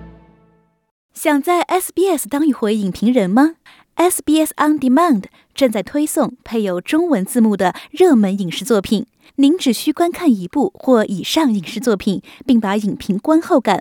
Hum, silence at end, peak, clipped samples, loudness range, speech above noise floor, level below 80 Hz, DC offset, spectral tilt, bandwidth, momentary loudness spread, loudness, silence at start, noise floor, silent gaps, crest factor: none; 0 s; -2 dBFS; under 0.1%; 1 LU; 40 dB; -54 dBFS; under 0.1%; -5 dB/octave; 19 kHz; 7 LU; -16 LUFS; 0 s; -56 dBFS; 0.91-1.09 s; 14 dB